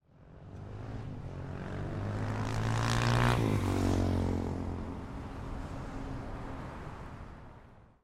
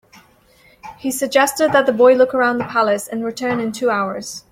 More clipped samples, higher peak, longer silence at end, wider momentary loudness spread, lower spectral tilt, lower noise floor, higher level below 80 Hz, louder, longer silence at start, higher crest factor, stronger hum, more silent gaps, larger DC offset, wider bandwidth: neither; second, -12 dBFS vs -2 dBFS; about the same, 0.2 s vs 0.15 s; first, 18 LU vs 12 LU; first, -6.5 dB/octave vs -3.5 dB/octave; about the same, -55 dBFS vs -52 dBFS; first, -44 dBFS vs -58 dBFS; second, -35 LUFS vs -17 LUFS; second, 0.15 s vs 0.85 s; first, 22 dB vs 16 dB; neither; neither; neither; second, 14.5 kHz vs 16 kHz